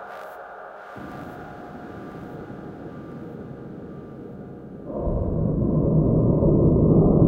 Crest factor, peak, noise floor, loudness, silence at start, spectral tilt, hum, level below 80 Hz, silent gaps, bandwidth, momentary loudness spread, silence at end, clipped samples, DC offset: 18 dB; -4 dBFS; -39 dBFS; -21 LUFS; 0 s; -11.5 dB/octave; none; -34 dBFS; none; 3.9 kHz; 21 LU; 0 s; under 0.1%; under 0.1%